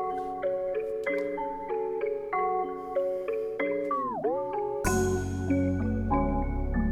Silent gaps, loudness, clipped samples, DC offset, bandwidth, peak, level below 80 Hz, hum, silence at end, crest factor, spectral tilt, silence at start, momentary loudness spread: none; -30 LUFS; under 0.1%; under 0.1%; 15.5 kHz; -12 dBFS; -40 dBFS; none; 0 s; 16 dB; -6.5 dB/octave; 0 s; 4 LU